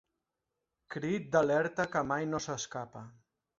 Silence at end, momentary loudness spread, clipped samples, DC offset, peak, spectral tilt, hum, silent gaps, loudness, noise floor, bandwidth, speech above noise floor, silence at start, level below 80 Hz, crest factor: 0.5 s; 16 LU; under 0.1%; under 0.1%; -12 dBFS; -4.5 dB/octave; none; none; -33 LUFS; -87 dBFS; 7.8 kHz; 54 dB; 0.9 s; -68 dBFS; 22 dB